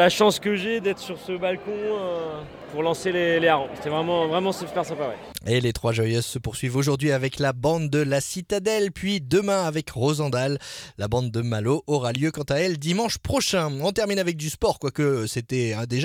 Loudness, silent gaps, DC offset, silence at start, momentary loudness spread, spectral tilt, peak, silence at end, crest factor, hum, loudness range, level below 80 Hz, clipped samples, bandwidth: -24 LUFS; none; under 0.1%; 0 s; 7 LU; -5 dB/octave; -6 dBFS; 0 s; 18 dB; none; 1 LU; -50 dBFS; under 0.1%; 17 kHz